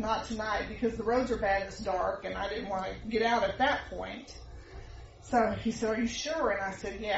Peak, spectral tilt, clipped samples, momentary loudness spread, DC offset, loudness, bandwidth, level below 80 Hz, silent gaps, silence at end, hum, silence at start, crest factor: -14 dBFS; -3 dB/octave; under 0.1%; 20 LU; under 0.1%; -31 LUFS; 8 kHz; -50 dBFS; none; 0 s; none; 0 s; 18 dB